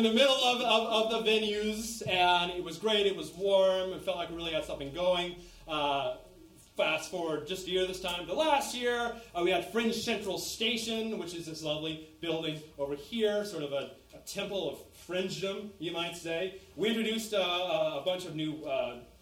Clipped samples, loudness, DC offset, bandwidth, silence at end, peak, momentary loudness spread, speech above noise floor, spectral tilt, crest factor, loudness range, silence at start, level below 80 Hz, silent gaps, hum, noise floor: under 0.1%; -31 LUFS; under 0.1%; 16.5 kHz; 0.15 s; -10 dBFS; 12 LU; 24 dB; -3.5 dB/octave; 22 dB; 7 LU; 0 s; -60 dBFS; none; none; -56 dBFS